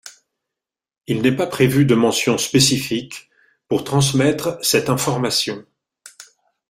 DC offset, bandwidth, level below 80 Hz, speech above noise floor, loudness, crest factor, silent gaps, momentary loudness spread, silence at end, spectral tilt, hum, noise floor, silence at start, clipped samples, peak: under 0.1%; 16 kHz; -52 dBFS; 69 dB; -18 LUFS; 18 dB; none; 11 LU; 0.45 s; -4.5 dB/octave; none; -86 dBFS; 0.05 s; under 0.1%; -2 dBFS